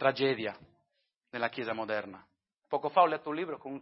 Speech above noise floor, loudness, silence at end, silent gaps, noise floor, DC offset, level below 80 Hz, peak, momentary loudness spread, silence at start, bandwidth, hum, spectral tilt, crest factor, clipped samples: 49 dB; -32 LUFS; 0 s; none; -80 dBFS; under 0.1%; -78 dBFS; -10 dBFS; 14 LU; 0 s; 5.8 kHz; none; -8.5 dB/octave; 22 dB; under 0.1%